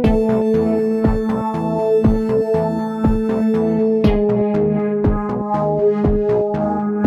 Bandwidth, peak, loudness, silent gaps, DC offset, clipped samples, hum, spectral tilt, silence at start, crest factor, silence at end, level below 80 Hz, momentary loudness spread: 8.4 kHz; -4 dBFS; -17 LUFS; none; under 0.1%; under 0.1%; none; -9.5 dB/octave; 0 s; 14 dB; 0 s; -28 dBFS; 4 LU